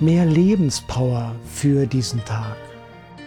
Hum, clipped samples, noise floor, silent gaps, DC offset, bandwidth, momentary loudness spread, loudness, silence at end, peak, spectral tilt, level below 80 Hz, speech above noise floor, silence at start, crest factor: none; under 0.1%; -41 dBFS; none; under 0.1%; 15 kHz; 14 LU; -20 LUFS; 0 s; -6 dBFS; -6.5 dB/octave; -44 dBFS; 22 dB; 0 s; 12 dB